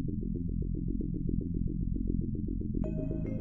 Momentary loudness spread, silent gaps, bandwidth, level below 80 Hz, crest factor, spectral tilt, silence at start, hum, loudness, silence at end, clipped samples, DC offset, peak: 1 LU; none; 2.7 kHz; -36 dBFS; 14 dB; -14 dB/octave; 0 s; none; -35 LUFS; 0 s; under 0.1%; under 0.1%; -18 dBFS